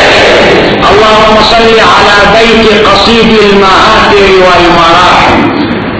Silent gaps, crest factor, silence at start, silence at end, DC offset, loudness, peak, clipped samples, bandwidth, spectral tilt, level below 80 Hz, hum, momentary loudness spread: none; 2 dB; 0 s; 0 s; under 0.1%; -2 LUFS; 0 dBFS; 20%; 8 kHz; -4.5 dB/octave; -24 dBFS; none; 2 LU